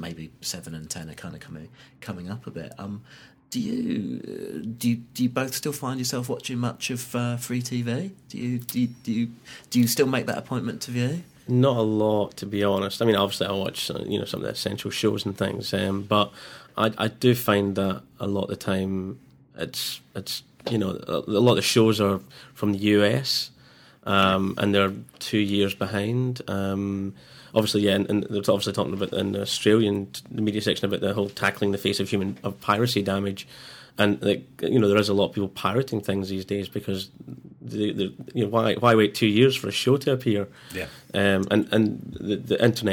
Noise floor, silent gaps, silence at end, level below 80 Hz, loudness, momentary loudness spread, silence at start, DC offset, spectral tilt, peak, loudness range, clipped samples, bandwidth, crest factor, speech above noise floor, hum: -53 dBFS; none; 0 s; -62 dBFS; -25 LUFS; 14 LU; 0 s; under 0.1%; -5 dB/octave; -4 dBFS; 6 LU; under 0.1%; 20 kHz; 22 dB; 28 dB; none